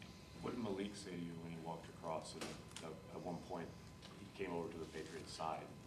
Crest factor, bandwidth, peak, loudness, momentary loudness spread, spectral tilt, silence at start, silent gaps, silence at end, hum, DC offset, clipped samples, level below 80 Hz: 18 dB; 13.5 kHz; -30 dBFS; -49 LUFS; 8 LU; -5 dB/octave; 0 s; none; 0 s; none; under 0.1%; under 0.1%; -70 dBFS